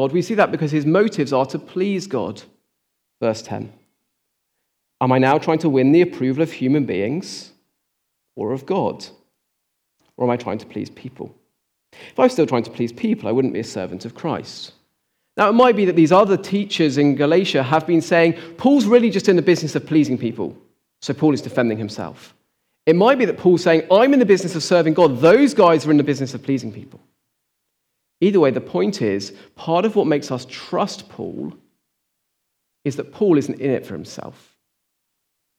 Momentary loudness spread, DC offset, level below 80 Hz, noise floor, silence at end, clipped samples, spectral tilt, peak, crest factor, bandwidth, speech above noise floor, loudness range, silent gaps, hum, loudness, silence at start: 18 LU; under 0.1%; -68 dBFS; -74 dBFS; 1.3 s; under 0.1%; -6.5 dB/octave; -2 dBFS; 16 dB; 13.5 kHz; 57 dB; 11 LU; none; none; -18 LUFS; 0 s